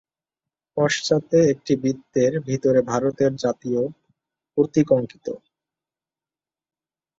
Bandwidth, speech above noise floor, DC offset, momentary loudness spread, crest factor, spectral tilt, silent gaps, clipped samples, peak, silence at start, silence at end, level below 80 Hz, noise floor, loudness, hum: 7.8 kHz; over 69 dB; under 0.1%; 12 LU; 20 dB; -6 dB/octave; none; under 0.1%; -4 dBFS; 0.75 s; 1.85 s; -60 dBFS; under -90 dBFS; -21 LUFS; none